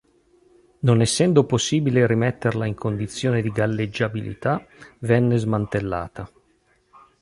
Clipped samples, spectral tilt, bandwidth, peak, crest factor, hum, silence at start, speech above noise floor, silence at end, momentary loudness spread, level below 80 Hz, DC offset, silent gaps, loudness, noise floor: under 0.1%; -6 dB/octave; 11.5 kHz; -4 dBFS; 20 dB; none; 0.85 s; 42 dB; 0.95 s; 10 LU; -50 dBFS; under 0.1%; none; -22 LUFS; -63 dBFS